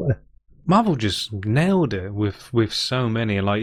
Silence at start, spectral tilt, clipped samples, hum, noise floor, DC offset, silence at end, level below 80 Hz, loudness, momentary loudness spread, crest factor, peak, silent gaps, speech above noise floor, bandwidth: 0 s; -6 dB/octave; under 0.1%; none; -50 dBFS; under 0.1%; 0 s; -48 dBFS; -22 LUFS; 7 LU; 16 dB; -6 dBFS; none; 30 dB; 15 kHz